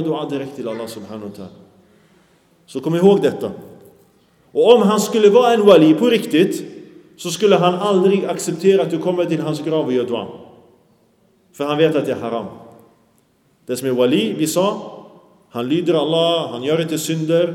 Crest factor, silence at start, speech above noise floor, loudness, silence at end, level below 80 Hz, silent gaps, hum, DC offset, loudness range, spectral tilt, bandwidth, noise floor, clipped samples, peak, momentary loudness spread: 18 dB; 0 s; 42 dB; -17 LUFS; 0 s; -68 dBFS; none; none; under 0.1%; 8 LU; -5.5 dB/octave; 16.5 kHz; -58 dBFS; under 0.1%; 0 dBFS; 18 LU